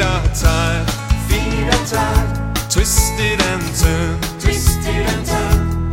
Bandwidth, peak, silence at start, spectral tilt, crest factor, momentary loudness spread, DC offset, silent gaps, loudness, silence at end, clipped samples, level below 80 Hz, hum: 16.5 kHz; 0 dBFS; 0 s; -4 dB/octave; 16 dB; 4 LU; under 0.1%; none; -17 LUFS; 0 s; under 0.1%; -20 dBFS; none